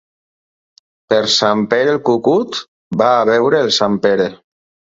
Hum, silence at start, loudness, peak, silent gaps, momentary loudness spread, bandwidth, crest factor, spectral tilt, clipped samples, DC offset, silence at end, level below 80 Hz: none; 1.1 s; -14 LUFS; 0 dBFS; 2.68-2.91 s; 8 LU; 7.8 kHz; 16 dB; -4 dB/octave; under 0.1%; under 0.1%; 0.6 s; -58 dBFS